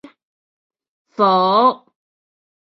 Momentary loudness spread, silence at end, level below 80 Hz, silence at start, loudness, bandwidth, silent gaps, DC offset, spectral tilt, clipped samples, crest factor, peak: 20 LU; 0.85 s; -70 dBFS; 1.2 s; -15 LUFS; 6 kHz; none; under 0.1%; -8 dB/octave; under 0.1%; 18 dB; -2 dBFS